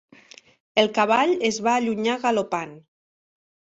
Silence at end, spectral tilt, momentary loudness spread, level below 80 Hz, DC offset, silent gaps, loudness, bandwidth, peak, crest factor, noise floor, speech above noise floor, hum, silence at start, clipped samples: 1 s; -3.5 dB/octave; 9 LU; -68 dBFS; under 0.1%; none; -22 LUFS; 8.2 kHz; -4 dBFS; 20 dB; -50 dBFS; 28 dB; none; 0.75 s; under 0.1%